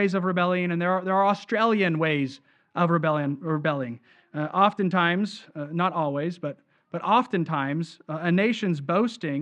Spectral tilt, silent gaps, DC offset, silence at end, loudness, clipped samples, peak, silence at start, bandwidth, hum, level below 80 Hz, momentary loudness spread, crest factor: -7 dB/octave; none; under 0.1%; 0 s; -25 LUFS; under 0.1%; -6 dBFS; 0 s; 8.8 kHz; none; -76 dBFS; 11 LU; 18 dB